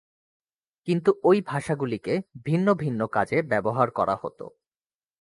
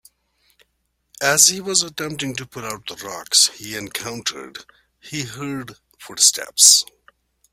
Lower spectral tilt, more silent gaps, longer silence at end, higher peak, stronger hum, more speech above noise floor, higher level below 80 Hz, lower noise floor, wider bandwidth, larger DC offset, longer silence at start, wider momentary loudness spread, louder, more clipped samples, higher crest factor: first, -7.5 dB/octave vs -0.5 dB/octave; neither; about the same, 0.75 s vs 0.7 s; second, -6 dBFS vs 0 dBFS; neither; first, over 66 dB vs 50 dB; about the same, -62 dBFS vs -62 dBFS; first, under -90 dBFS vs -70 dBFS; second, 11.5 kHz vs 16.5 kHz; neither; second, 0.85 s vs 1.2 s; second, 10 LU vs 20 LU; second, -25 LUFS vs -16 LUFS; neither; about the same, 20 dB vs 22 dB